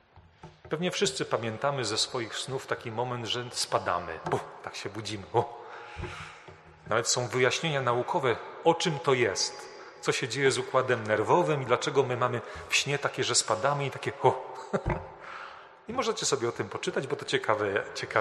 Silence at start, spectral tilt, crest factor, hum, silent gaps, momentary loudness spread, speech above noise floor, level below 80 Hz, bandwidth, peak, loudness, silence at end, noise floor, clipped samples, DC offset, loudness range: 0.15 s; -3.5 dB/octave; 22 dB; none; none; 14 LU; 23 dB; -56 dBFS; 13 kHz; -8 dBFS; -29 LUFS; 0 s; -52 dBFS; under 0.1%; under 0.1%; 6 LU